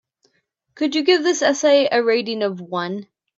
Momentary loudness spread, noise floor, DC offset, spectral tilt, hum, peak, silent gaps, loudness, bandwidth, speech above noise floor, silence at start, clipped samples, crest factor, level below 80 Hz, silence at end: 10 LU; -68 dBFS; under 0.1%; -3.5 dB/octave; none; -4 dBFS; none; -19 LUFS; 7.8 kHz; 50 dB; 0.75 s; under 0.1%; 16 dB; -74 dBFS; 0.35 s